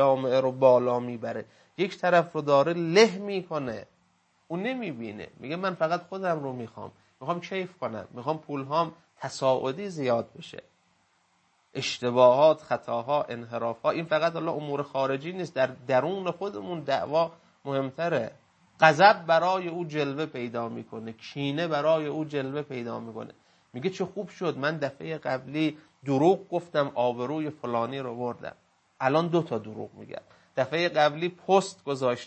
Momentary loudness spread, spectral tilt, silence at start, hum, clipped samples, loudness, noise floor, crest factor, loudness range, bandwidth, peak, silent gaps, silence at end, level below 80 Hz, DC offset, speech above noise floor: 17 LU; -5.5 dB/octave; 0 s; none; under 0.1%; -27 LUFS; -68 dBFS; 24 dB; 8 LU; 8.6 kHz; -2 dBFS; none; 0 s; -74 dBFS; under 0.1%; 41 dB